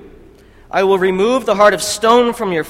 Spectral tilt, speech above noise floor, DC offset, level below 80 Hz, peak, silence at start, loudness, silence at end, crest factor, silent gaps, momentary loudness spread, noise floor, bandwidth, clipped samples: -4 dB/octave; 30 dB; under 0.1%; -46 dBFS; 0 dBFS; 0 s; -13 LUFS; 0 s; 14 dB; none; 5 LU; -43 dBFS; 16.5 kHz; under 0.1%